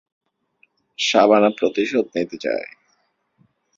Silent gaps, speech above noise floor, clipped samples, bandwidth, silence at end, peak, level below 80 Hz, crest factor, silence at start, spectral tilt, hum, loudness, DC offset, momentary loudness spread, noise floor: none; 48 dB; under 0.1%; 7.6 kHz; 1.1 s; -2 dBFS; -66 dBFS; 20 dB; 1 s; -4 dB/octave; none; -19 LUFS; under 0.1%; 13 LU; -67 dBFS